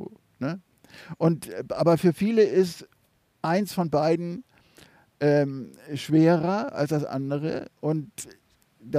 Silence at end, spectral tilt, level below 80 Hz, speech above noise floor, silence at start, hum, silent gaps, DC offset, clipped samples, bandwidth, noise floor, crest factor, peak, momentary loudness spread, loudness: 0 s; -7 dB/octave; -66 dBFS; 42 dB; 0 s; none; none; under 0.1%; under 0.1%; 15.5 kHz; -67 dBFS; 16 dB; -8 dBFS; 18 LU; -25 LUFS